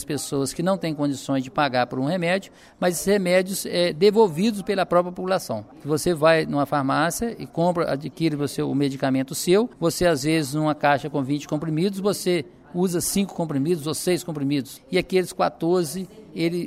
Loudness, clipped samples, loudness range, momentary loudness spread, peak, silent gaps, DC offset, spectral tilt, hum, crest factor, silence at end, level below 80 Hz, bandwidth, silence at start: -23 LUFS; under 0.1%; 3 LU; 7 LU; -6 dBFS; none; under 0.1%; -5 dB/octave; none; 16 dB; 0 s; -54 dBFS; 16 kHz; 0 s